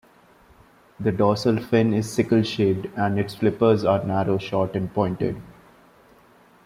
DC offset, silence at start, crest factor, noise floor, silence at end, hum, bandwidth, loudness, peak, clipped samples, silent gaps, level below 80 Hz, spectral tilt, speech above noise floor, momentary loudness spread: under 0.1%; 1 s; 18 dB; -54 dBFS; 1.15 s; none; 15.5 kHz; -22 LUFS; -6 dBFS; under 0.1%; none; -56 dBFS; -7 dB/octave; 33 dB; 6 LU